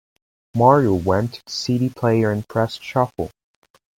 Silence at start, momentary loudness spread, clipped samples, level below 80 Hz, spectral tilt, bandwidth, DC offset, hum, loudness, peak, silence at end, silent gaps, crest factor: 0.55 s; 12 LU; under 0.1%; -54 dBFS; -6.5 dB/octave; 16.5 kHz; under 0.1%; none; -20 LUFS; 0 dBFS; 0.7 s; none; 20 dB